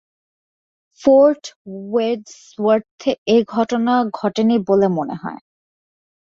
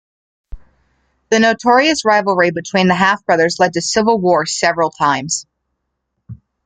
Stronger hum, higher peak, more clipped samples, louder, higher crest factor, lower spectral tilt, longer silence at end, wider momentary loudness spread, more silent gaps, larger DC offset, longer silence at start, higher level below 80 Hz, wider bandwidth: neither; about the same, -2 dBFS vs 0 dBFS; neither; second, -18 LUFS vs -14 LUFS; about the same, 16 dB vs 16 dB; first, -6.5 dB/octave vs -3.5 dB/octave; first, 0.85 s vs 0.3 s; first, 15 LU vs 5 LU; first, 1.56-1.65 s, 2.91-2.98 s, 3.18-3.26 s vs none; neither; first, 1 s vs 0.5 s; second, -60 dBFS vs -46 dBFS; second, 7.6 kHz vs 9.4 kHz